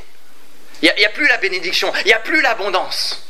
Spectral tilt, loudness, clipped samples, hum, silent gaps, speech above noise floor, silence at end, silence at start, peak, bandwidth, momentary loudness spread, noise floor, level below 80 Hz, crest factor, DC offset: -1 dB/octave; -15 LUFS; under 0.1%; none; none; 32 dB; 0.1 s; 0.75 s; 0 dBFS; 16 kHz; 6 LU; -49 dBFS; -64 dBFS; 18 dB; 5%